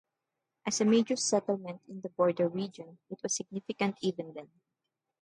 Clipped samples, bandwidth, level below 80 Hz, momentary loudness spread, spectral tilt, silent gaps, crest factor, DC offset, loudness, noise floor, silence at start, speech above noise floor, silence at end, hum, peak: under 0.1%; 11.5 kHz; -80 dBFS; 17 LU; -4 dB/octave; none; 18 dB; under 0.1%; -31 LUFS; -87 dBFS; 0.65 s; 55 dB; 0.75 s; none; -14 dBFS